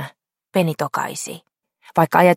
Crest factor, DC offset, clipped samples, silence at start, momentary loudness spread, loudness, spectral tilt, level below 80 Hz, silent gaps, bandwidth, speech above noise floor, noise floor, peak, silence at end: 20 dB; under 0.1%; under 0.1%; 0 s; 17 LU; -21 LUFS; -5.5 dB/octave; -66 dBFS; none; 16.5 kHz; 24 dB; -42 dBFS; 0 dBFS; 0 s